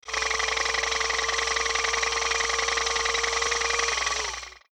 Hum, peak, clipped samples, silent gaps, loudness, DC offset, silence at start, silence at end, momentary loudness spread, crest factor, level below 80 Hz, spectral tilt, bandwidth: none; -10 dBFS; under 0.1%; none; -24 LUFS; under 0.1%; 0.05 s; 0.15 s; 2 LU; 16 dB; -46 dBFS; 1 dB/octave; over 20 kHz